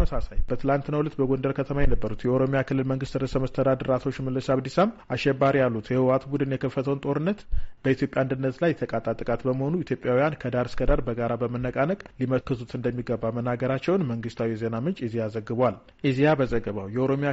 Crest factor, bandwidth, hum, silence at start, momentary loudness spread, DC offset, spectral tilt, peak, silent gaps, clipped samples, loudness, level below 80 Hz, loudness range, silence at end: 14 dB; 8 kHz; none; 0 s; 6 LU; under 0.1%; -7 dB/octave; -10 dBFS; none; under 0.1%; -26 LUFS; -36 dBFS; 3 LU; 0 s